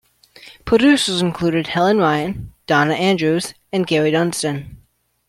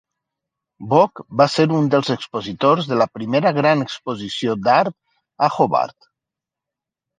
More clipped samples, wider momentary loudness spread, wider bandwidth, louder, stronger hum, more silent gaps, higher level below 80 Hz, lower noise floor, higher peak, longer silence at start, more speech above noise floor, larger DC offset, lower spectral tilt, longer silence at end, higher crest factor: neither; about the same, 10 LU vs 10 LU; first, 16 kHz vs 9.4 kHz; about the same, -17 LUFS vs -18 LUFS; neither; neither; first, -48 dBFS vs -62 dBFS; second, -57 dBFS vs -86 dBFS; about the same, -2 dBFS vs -2 dBFS; second, 0.45 s vs 0.8 s; second, 40 dB vs 68 dB; neither; about the same, -5 dB/octave vs -6 dB/octave; second, 0.5 s vs 1.3 s; about the same, 16 dB vs 18 dB